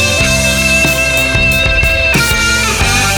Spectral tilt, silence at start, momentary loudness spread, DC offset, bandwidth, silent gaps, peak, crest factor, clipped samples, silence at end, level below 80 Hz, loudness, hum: -3 dB/octave; 0 s; 1 LU; under 0.1%; over 20 kHz; none; 0 dBFS; 10 dB; under 0.1%; 0 s; -20 dBFS; -9 LUFS; none